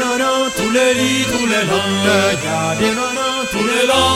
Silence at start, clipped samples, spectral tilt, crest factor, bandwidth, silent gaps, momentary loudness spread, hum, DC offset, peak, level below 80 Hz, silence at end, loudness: 0 s; under 0.1%; -3 dB/octave; 14 dB; 16.5 kHz; none; 4 LU; none; under 0.1%; -2 dBFS; -44 dBFS; 0 s; -15 LUFS